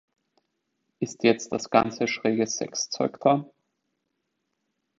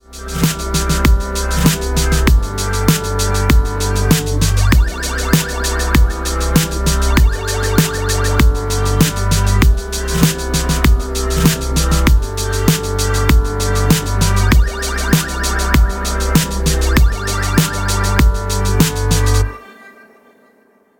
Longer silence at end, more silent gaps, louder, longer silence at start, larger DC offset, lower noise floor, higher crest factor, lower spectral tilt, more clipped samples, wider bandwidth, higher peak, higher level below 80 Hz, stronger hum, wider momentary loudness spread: first, 1.55 s vs 1.1 s; neither; second, -25 LUFS vs -15 LUFS; first, 1 s vs 0.1 s; neither; first, -79 dBFS vs -53 dBFS; first, 24 dB vs 14 dB; about the same, -4 dB/octave vs -4.5 dB/octave; neither; second, 8 kHz vs 17.5 kHz; about the same, -2 dBFS vs 0 dBFS; second, -66 dBFS vs -16 dBFS; neither; about the same, 6 LU vs 4 LU